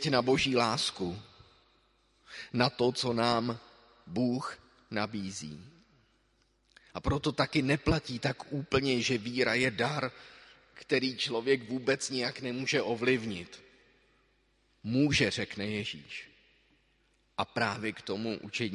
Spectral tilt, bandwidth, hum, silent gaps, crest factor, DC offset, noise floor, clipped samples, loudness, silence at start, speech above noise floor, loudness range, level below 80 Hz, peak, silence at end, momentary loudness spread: -4.5 dB/octave; 11.5 kHz; none; none; 24 dB; under 0.1%; -71 dBFS; under 0.1%; -31 LUFS; 0 s; 40 dB; 6 LU; -54 dBFS; -8 dBFS; 0 s; 16 LU